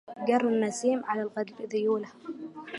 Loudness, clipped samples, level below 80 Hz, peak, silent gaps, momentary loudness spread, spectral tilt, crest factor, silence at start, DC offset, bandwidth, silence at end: -29 LUFS; under 0.1%; -82 dBFS; -12 dBFS; none; 15 LU; -5 dB/octave; 18 dB; 0.1 s; under 0.1%; 11.5 kHz; 0 s